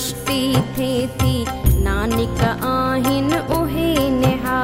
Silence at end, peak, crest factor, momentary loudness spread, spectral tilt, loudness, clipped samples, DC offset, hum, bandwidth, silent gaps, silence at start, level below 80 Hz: 0 s; -2 dBFS; 16 dB; 3 LU; -5.5 dB/octave; -19 LUFS; under 0.1%; under 0.1%; none; 16 kHz; none; 0 s; -28 dBFS